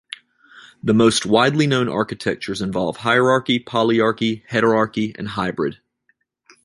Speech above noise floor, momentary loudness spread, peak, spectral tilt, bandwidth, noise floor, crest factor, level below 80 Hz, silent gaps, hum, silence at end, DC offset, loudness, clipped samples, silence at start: 48 dB; 9 LU; -2 dBFS; -5 dB/octave; 11.5 kHz; -66 dBFS; 18 dB; -54 dBFS; none; none; 0.9 s; under 0.1%; -19 LUFS; under 0.1%; 0.1 s